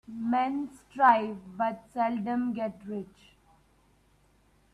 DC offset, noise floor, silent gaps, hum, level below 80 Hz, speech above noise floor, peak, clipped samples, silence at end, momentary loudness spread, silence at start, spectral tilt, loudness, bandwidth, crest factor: under 0.1%; -65 dBFS; none; none; -68 dBFS; 36 dB; -8 dBFS; under 0.1%; 1.7 s; 17 LU; 0.1 s; -7 dB/octave; -29 LUFS; 11 kHz; 22 dB